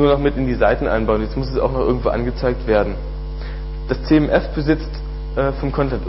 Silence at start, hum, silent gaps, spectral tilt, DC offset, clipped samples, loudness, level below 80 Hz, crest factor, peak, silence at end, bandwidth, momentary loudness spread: 0 s; none; none; -10.5 dB/octave; under 0.1%; under 0.1%; -20 LUFS; -26 dBFS; 16 dB; -2 dBFS; 0 s; 5.8 kHz; 13 LU